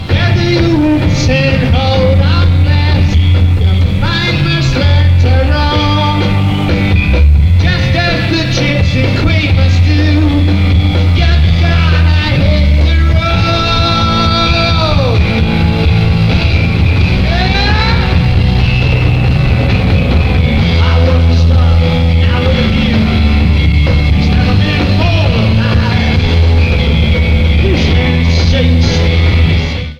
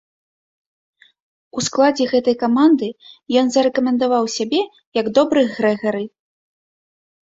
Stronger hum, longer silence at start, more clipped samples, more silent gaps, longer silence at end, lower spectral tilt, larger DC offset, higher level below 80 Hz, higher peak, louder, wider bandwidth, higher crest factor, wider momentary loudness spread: neither; second, 0 s vs 1.55 s; neither; second, none vs 4.87-4.92 s; second, 0.05 s vs 1.15 s; first, -7 dB/octave vs -4 dB/octave; neither; first, -14 dBFS vs -62 dBFS; about the same, 0 dBFS vs -2 dBFS; first, -10 LUFS vs -18 LUFS; about the same, 7.2 kHz vs 7.8 kHz; second, 8 dB vs 18 dB; second, 2 LU vs 9 LU